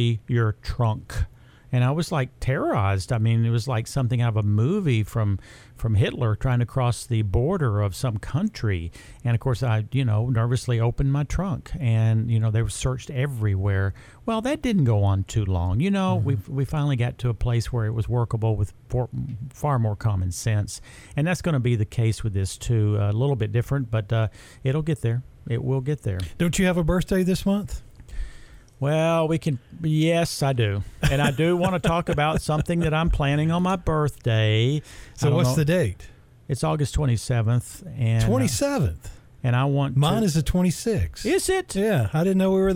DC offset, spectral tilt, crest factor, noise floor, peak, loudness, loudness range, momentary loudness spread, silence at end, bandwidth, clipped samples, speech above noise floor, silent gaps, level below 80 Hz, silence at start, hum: under 0.1%; -6.5 dB/octave; 14 dB; -45 dBFS; -8 dBFS; -24 LUFS; 3 LU; 7 LU; 0 s; 15.5 kHz; under 0.1%; 22 dB; none; -38 dBFS; 0 s; none